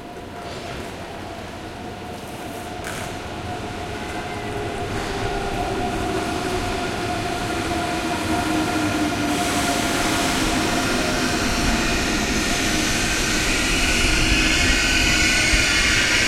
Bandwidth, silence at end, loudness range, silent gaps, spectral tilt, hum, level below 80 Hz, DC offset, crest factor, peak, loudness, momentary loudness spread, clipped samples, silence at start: 16.5 kHz; 0 s; 13 LU; none; -3 dB/octave; none; -32 dBFS; under 0.1%; 18 dB; -4 dBFS; -21 LUFS; 16 LU; under 0.1%; 0 s